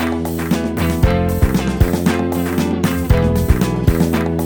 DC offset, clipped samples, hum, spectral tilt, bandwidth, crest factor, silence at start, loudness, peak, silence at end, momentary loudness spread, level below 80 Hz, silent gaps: under 0.1%; under 0.1%; none; -6.5 dB/octave; 20 kHz; 16 dB; 0 s; -17 LUFS; 0 dBFS; 0 s; 3 LU; -22 dBFS; none